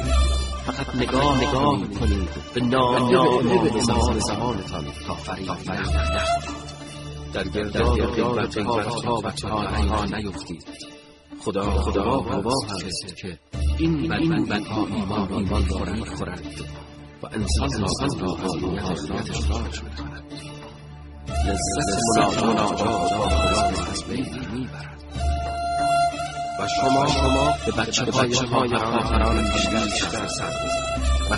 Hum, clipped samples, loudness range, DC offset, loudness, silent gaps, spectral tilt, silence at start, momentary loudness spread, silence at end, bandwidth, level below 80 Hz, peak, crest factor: none; under 0.1%; 6 LU; under 0.1%; -23 LUFS; none; -5 dB/octave; 0 s; 15 LU; 0 s; 11.5 kHz; -30 dBFS; -4 dBFS; 18 dB